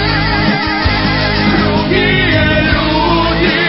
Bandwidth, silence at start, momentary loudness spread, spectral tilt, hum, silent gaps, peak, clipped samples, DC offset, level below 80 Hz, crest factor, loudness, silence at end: 5.8 kHz; 0 s; 2 LU; -9 dB/octave; none; none; 0 dBFS; under 0.1%; under 0.1%; -22 dBFS; 12 dB; -11 LUFS; 0 s